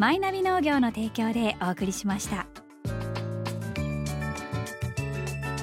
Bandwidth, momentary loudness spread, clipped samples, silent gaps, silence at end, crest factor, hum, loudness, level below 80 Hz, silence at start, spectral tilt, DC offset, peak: 16.5 kHz; 9 LU; under 0.1%; none; 0 s; 18 dB; none; -29 LUFS; -46 dBFS; 0 s; -5.5 dB/octave; under 0.1%; -10 dBFS